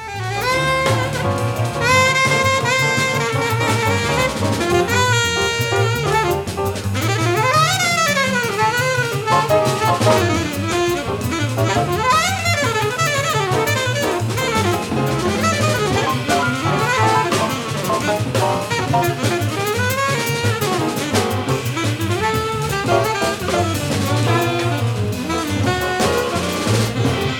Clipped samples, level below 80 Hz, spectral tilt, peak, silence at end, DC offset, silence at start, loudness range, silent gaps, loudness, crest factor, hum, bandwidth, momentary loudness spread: under 0.1%; -42 dBFS; -4.5 dB/octave; -2 dBFS; 0 s; under 0.1%; 0 s; 3 LU; none; -17 LUFS; 16 dB; none; 19 kHz; 5 LU